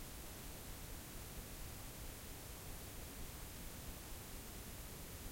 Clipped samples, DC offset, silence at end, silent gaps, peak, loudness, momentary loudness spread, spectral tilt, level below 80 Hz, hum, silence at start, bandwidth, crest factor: under 0.1%; under 0.1%; 0 s; none; -36 dBFS; -51 LUFS; 0 LU; -3.5 dB/octave; -54 dBFS; none; 0 s; 16.5 kHz; 14 dB